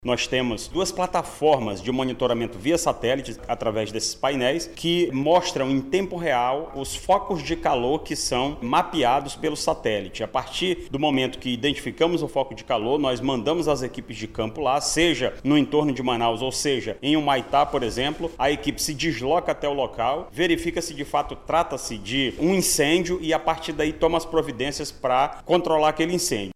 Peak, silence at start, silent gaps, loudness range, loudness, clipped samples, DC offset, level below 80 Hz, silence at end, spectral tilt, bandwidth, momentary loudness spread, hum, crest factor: -6 dBFS; 0 s; none; 2 LU; -24 LUFS; under 0.1%; under 0.1%; -44 dBFS; 0.05 s; -4 dB/octave; 15.5 kHz; 6 LU; none; 16 dB